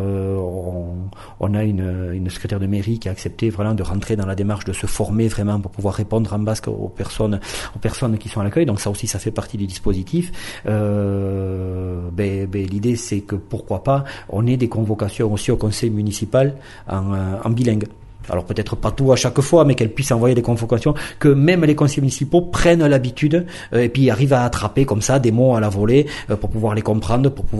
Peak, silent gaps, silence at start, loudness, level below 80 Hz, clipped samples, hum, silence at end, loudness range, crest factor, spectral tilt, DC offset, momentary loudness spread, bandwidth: -2 dBFS; none; 0 s; -19 LUFS; -36 dBFS; under 0.1%; none; 0 s; 6 LU; 16 dB; -6.5 dB/octave; under 0.1%; 11 LU; 12 kHz